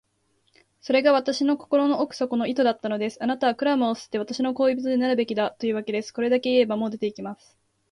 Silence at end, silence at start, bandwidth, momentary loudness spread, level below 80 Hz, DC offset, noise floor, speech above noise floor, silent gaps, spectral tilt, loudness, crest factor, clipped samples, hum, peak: 0.55 s; 0.85 s; 11 kHz; 9 LU; -70 dBFS; under 0.1%; -69 dBFS; 45 dB; none; -5 dB/octave; -24 LUFS; 18 dB; under 0.1%; none; -6 dBFS